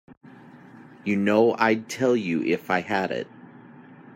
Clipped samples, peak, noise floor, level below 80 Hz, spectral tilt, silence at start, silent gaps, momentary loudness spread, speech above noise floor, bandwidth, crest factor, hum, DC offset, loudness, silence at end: under 0.1%; -6 dBFS; -47 dBFS; -72 dBFS; -6 dB/octave; 0.1 s; 0.17-0.21 s; 11 LU; 24 dB; 16 kHz; 18 dB; none; under 0.1%; -24 LUFS; 0.15 s